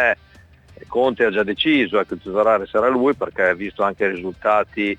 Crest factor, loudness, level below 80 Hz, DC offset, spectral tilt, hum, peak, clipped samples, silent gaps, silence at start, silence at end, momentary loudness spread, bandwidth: 16 dB; -19 LUFS; -54 dBFS; under 0.1%; -6 dB/octave; none; -4 dBFS; under 0.1%; none; 0 s; 0 s; 6 LU; 8.8 kHz